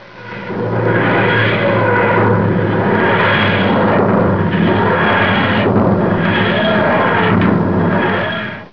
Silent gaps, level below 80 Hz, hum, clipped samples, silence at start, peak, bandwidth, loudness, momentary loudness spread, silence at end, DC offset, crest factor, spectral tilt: none; -42 dBFS; none; under 0.1%; 0 s; -2 dBFS; 5.4 kHz; -13 LUFS; 5 LU; 0.05 s; 1%; 10 dB; -9 dB/octave